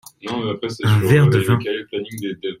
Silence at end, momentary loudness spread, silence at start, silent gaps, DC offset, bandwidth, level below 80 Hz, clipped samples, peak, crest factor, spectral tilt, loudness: 0.05 s; 14 LU; 0.25 s; none; under 0.1%; 15.5 kHz; -52 dBFS; under 0.1%; -2 dBFS; 16 dB; -6.5 dB/octave; -19 LUFS